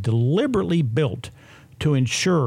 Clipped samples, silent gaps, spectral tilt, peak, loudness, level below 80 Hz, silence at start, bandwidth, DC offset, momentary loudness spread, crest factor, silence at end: under 0.1%; none; -6 dB/octave; -10 dBFS; -21 LUFS; -50 dBFS; 0 s; 13.5 kHz; under 0.1%; 8 LU; 12 dB; 0 s